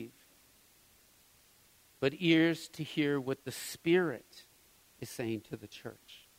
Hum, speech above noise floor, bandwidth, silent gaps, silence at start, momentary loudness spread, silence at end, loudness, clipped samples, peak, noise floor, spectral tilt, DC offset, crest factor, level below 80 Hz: none; 31 dB; 16 kHz; none; 0 s; 21 LU; 0.2 s; -33 LUFS; under 0.1%; -16 dBFS; -64 dBFS; -5 dB/octave; under 0.1%; 20 dB; -74 dBFS